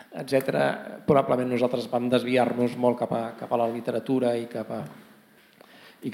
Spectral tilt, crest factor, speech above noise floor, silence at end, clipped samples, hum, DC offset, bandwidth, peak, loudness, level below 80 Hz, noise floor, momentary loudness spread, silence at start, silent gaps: -6.5 dB/octave; 18 dB; 30 dB; 0 s; under 0.1%; none; under 0.1%; 16.5 kHz; -8 dBFS; -26 LUFS; -70 dBFS; -56 dBFS; 11 LU; 0.1 s; none